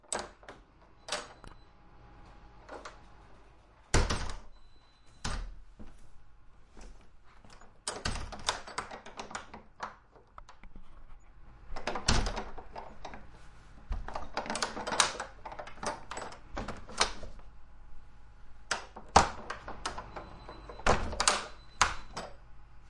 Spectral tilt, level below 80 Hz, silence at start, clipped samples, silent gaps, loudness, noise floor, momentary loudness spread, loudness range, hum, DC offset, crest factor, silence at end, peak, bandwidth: -2.5 dB/octave; -44 dBFS; 0.05 s; under 0.1%; none; -34 LUFS; -58 dBFS; 27 LU; 12 LU; none; under 0.1%; 32 dB; 0 s; -6 dBFS; 11.5 kHz